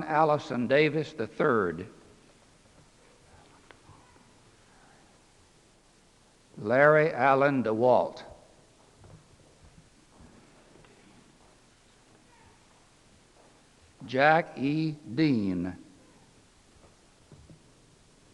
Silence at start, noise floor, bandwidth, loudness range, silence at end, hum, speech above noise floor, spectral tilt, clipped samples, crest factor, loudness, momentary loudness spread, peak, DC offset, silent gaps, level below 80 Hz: 0 s; -61 dBFS; 11 kHz; 9 LU; 2.6 s; none; 36 dB; -7 dB/octave; under 0.1%; 24 dB; -26 LUFS; 16 LU; -6 dBFS; under 0.1%; none; -66 dBFS